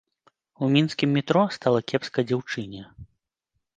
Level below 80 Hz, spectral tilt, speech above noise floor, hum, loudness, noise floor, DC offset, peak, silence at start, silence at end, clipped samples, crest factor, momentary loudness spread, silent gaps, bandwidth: -62 dBFS; -6.5 dB/octave; 55 dB; none; -24 LUFS; -79 dBFS; under 0.1%; -4 dBFS; 0.6 s; 0.75 s; under 0.1%; 22 dB; 11 LU; none; 9 kHz